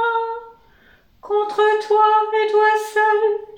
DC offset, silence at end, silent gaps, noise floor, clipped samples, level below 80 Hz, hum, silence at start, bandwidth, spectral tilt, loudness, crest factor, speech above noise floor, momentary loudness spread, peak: under 0.1%; 0 s; none; -53 dBFS; under 0.1%; -64 dBFS; none; 0 s; 15.5 kHz; -1.5 dB/octave; -17 LUFS; 14 dB; 37 dB; 8 LU; -4 dBFS